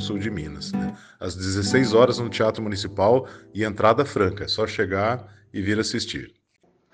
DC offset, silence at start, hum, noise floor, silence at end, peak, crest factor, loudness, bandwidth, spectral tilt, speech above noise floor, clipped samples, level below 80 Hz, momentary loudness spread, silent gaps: under 0.1%; 0 s; none; -64 dBFS; 0.65 s; -4 dBFS; 20 dB; -23 LUFS; 9.8 kHz; -5 dB/octave; 41 dB; under 0.1%; -52 dBFS; 13 LU; none